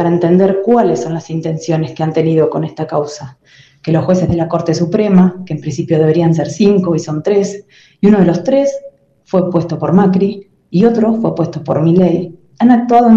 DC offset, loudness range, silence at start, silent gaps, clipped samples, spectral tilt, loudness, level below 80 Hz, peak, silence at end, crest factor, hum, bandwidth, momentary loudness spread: under 0.1%; 3 LU; 0 s; none; under 0.1%; -8 dB/octave; -13 LUFS; -48 dBFS; 0 dBFS; 0 s; 12 dB; none; 7.6 kHz; 9 LU